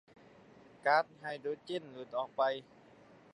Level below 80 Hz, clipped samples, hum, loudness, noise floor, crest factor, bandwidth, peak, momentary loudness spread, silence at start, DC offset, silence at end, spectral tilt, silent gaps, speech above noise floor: -84 dBFS; under 0.1%; none; -36 LUFS; -60 dBFS; 22 dB; 10.5 kHz; -16 dBFS; 11 LU; 0.85 s; under 0.1%; 0.7 s; -5 dB/octave; none; 25 dB